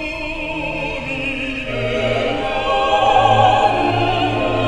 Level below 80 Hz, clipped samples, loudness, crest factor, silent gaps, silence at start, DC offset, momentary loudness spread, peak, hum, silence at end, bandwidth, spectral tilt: -34 dBFS; under 0.1%; -17 LUFS; 16 dB; none; 0 s; 0.4%; 10 LU; -2 dBFS; none; 0 s; 10.5 kHz; -5.5 dB/octave